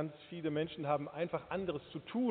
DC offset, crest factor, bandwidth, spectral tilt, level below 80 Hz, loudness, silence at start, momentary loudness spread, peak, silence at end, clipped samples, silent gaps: under 0.1%; 18 dB; 4.6 kHz; -5.5 dB/octave; -70 dBFS; -39 LUFS; 0 s; 6 LU; -20 dBFS; 0 s; under 0.1%; none